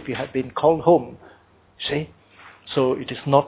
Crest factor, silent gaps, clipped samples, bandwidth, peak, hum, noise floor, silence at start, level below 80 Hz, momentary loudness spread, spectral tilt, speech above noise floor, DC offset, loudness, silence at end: 22 dB; none; under 0.1%; 4 kHz; -2 dBFS; none; -48 dBFS; 0 s; -54 dBFS; 17 LU; -10.5 dB/octave; 27 dB; under 0.1%; -22 LUFS; 0 s